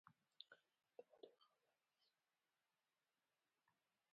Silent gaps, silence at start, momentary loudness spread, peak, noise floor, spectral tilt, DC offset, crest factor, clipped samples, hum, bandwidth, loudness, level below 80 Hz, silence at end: none; 0.05 s; 4 LU; -40 dBFS; under -90 dBFS; -0.5 dB/octave; under 0.1%; 34 dB; under 0.1%; none; 4.9 kHz; -67 LUFS; under -90 dBFS; 0.4 s